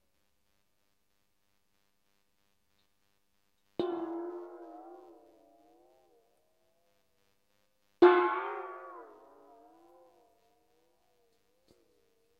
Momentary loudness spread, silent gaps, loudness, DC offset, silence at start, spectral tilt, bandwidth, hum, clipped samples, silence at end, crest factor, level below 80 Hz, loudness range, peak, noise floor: 27 LU; none; -30 LUFS; under 0.1%; 3.8 s; -6.5 dB/octave; 5.2 kHz; none; under 0.1%; 3.35 s; 28 dB; -82 dBFS; 17 LU; -10 dBFS; -80 dBFS